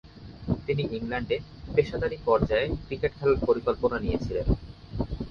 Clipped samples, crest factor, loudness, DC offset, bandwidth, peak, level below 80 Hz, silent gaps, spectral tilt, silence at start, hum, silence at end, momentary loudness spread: under 0.1%; 20 dB; -28 LUFS; under 0.1%; 6.8 kHz; -8 dBFS; -38 dBFS; none; -8 dB/octave; 0.05 s; none; 0 s; 9 LU